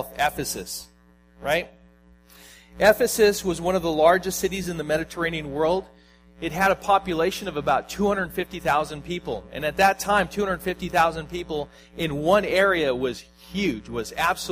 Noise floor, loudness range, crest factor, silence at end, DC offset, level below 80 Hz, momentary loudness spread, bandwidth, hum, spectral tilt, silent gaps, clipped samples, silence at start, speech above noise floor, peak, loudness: -54 dBFS; 3 LU; 22 dB; 0 s; under 0.1%; -48 dBFS; 12 LU; 15.5 kHz; none; -4 dB/octave; none; under 0.1%; 0 s; 30 dB; -2 dBFS; -24 LUFS